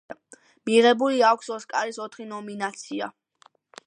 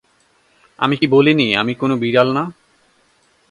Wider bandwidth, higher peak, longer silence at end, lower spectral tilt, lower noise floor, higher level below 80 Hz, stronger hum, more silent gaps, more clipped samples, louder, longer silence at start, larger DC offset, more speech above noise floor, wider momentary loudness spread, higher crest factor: about the same, 10 kHz vs 10.5 kHz; second, -6 dBFS vs 0 dBFS; second, 0.75 s vs 1 s; second, -3.5 dB/octave vs -7 dB/octave; about the same, -60 dBFS vs -58 dBFS; second, -80 dBFS vs -58 dBFS; neither; neither; neither; second, -23 LUFS vs -15 LUFS; second, 0.1 s vs 0.8 s; neither; second, 36 dB vs 43 dB; first, 17 LU vs 9 LU; about the same, 18 dB vs 18 dB